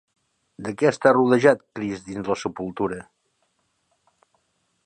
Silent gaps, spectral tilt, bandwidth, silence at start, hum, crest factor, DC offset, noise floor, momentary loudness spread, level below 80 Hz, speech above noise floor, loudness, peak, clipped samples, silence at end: none; -6 dB/octave; 9.6 kHz; 0.6 s; none; 22 dB; under 0.1%; -70 dBFS; 15 LU; -60 dBFS; 49 dB; -22 LUFS; -2 dBFS; under 0.1%; 1.85 s